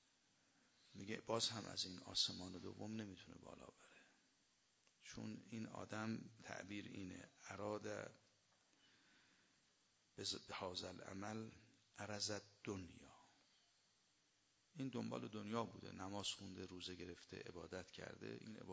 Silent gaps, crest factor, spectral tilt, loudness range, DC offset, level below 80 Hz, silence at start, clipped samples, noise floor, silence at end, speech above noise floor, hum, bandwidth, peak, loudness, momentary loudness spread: none; 26 dB; -3.5 dB/octave; 8 LU; under 0.1%; -76 dBFS; 0.8 s; under 0.1%; -80 dBFS; 0 s; 30 dB; none; 8 kHz; -26 dBFS; -49 LUFS; 17 LU